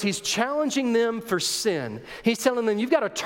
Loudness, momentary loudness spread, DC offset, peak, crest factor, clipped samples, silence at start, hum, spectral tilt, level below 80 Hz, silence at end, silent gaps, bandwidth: -24 LUFS; 4 LU; under 0.1%; -6 dBFS; 18 dB; under 0.1%; 0 s; none; -3.5 dB/octave; -62 dBFS; 0 s; none; 17 kHz